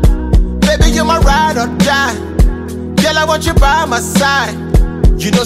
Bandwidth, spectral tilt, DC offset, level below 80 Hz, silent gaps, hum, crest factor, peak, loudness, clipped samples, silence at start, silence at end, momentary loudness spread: 15.5 kHz; -5 dB/octave; under 0.1%; -14 dBFS; none; none; 10 dB; 0 dBFS; -12 LUFS; under 0.1%; 0 s; 0 s; 4 LU